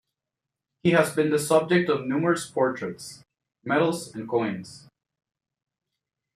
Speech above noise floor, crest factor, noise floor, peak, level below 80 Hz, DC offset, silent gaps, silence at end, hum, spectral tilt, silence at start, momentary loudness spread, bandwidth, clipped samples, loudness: 63 dB; 22 dB; -87 dBFS; -6 dBFS; -68 dBFS; under 0.1%; none; 1.6 s; none; -5.5 dB/octave; 0.85 s; 16 LU; 15 kHz; under 0.1%; -24 LUFS